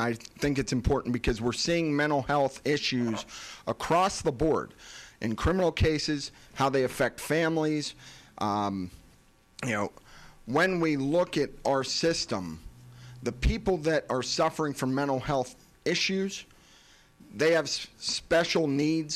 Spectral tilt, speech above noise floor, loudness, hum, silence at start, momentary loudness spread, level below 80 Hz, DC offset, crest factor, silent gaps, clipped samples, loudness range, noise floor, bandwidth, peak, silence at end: -4.5 dB/octave; 32 dB; -28 LUFS; none; 0 s; 12 LU; -44 dBFS; under 0.1%; 16 dB; none; under 0.1%; 2 LU; -60 dBFS; 14.5 kHz; -12 dBFS; 0 s